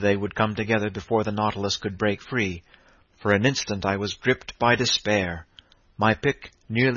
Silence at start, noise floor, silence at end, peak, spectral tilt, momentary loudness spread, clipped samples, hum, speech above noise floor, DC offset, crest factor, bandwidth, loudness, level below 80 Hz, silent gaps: 0 s; -55 dBFS; 0 s; -6 dBFS; -4.5 dB/octave; 8 LU; under 0.1%; none; 30 dB; under 0.1%; 18 dB; 7.4 kHz; -24 LUFS; -52 dBFS; none